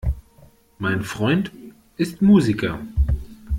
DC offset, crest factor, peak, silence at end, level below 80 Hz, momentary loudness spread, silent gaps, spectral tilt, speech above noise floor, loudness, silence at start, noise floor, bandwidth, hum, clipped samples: under 0.1%; 16 dB; -4 dBFS; 0 s; -30 dBFS; 14 LU; none; -7 dB/octave; 32 dB; -21 LUFS; 0.05 s; -52 dBFS; 14 kHz; none; under 0.1%